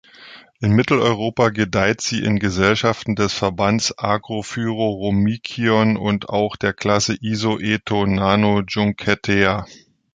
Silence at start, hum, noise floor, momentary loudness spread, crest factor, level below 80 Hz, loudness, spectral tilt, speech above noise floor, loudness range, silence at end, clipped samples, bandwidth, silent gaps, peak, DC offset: 0.2 s; none; -43 dBFS; 5 LU; 18 dB; -44 dBFS; -19 LUFS; -5 dB/octave; 25 dB; 2 LU; 0.4 s; under 0.1%; 9.2 kHz; none; -2 dBFS; under 0.1%